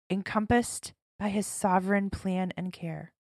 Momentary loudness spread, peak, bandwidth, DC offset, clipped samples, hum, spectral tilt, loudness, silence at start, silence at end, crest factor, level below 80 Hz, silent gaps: 12 LU; -12 dBFS; 14.5 kHz; under 0.1%; under 0.1%; none; -5.5 dB/octave; -30 LUFS; 0.1 s; 0.25 s; 18 dB; -54 dBFS; 1.02-1.19 s